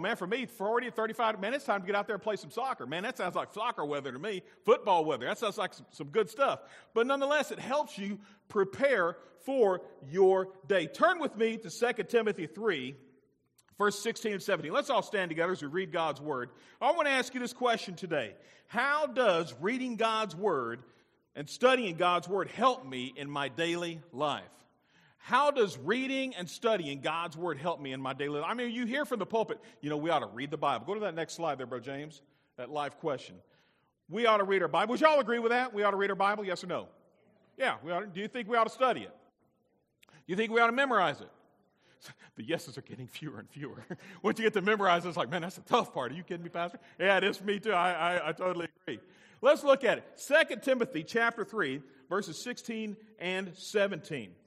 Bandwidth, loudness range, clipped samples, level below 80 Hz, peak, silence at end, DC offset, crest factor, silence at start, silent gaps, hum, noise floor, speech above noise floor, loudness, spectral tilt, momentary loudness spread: 14.5 kHz; 5 LU; under 0.1%; -82 dBFS; -8 dBFS; 0.15 s; under 0.1%; 24 dB; 0 s; none; none; -75 dBFS; 43 dB; -31 LUFS; -4.5 dB/octave; 13 LU